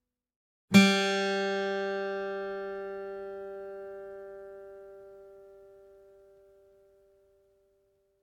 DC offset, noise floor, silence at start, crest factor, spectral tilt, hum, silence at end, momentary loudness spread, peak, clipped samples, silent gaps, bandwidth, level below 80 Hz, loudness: under 0.1%; -71 dBFS; 0.7 s; 26 dB; -5 dB/octave; none; 2.55 s; 26 LU; -8 dBFS; under 0.1%; none; 15 kHz; -72 dBFS; -28 LUFS